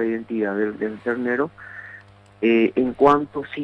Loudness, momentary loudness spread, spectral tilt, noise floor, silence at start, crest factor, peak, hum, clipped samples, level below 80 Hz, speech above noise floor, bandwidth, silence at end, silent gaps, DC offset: -21 LUFS; 20 LU; -7.5 dB/octave; -45 dBFS; 0 s; 18 dB; -4 dBFS; 50 Hz at -50 dBFS; under 0.1%; -58 dBFS; 24 dB; 6.8 kHz; 0 s; none; under 0.1%